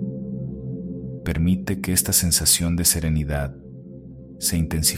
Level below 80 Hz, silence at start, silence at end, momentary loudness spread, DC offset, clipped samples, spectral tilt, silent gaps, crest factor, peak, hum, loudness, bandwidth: -36 dBFS; 0 s; 0 s; 24 LU; under 0.1%; under 0.1%; -3.5 dB/octave; none; 20 dB; -4 dBFS; none; -21 LUFS; 16.5 kHz